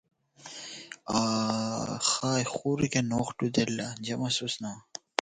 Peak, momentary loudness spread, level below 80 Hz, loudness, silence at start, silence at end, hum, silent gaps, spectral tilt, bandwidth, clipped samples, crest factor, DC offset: 0 dBFS; 14 LU; -62 dBFS; -29 LUFS; 0.4 s; 0.25 s; none; none; -4 dB/octave; 9.6 kHz; under 0.1%; 30 dB; under 0.1%